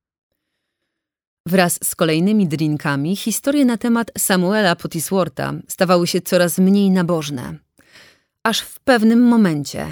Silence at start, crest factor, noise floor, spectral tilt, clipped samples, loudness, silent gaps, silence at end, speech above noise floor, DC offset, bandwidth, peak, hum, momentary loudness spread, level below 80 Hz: 1.45 s; 16 dB; -78 dBFS; -5 dB/octave; under 0.1%; -17 LUFS; none; 0 s; 62 dB; under 0.1%; over 20 kHz; -2 dBFS; none; 9 LU; -56 dBFS